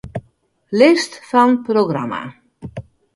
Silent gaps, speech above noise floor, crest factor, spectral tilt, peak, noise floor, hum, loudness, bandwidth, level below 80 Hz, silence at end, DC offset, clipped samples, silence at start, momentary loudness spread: none; 41 dB; 18 dB; -5.5 dB/octave; 0 dBFS; -56 dBFS; none; -16 LUFS; 11.5 kHz; -50 dBFS; 0.35 s; under 0.1%; under 0.1%; 0.05 s; 21 LU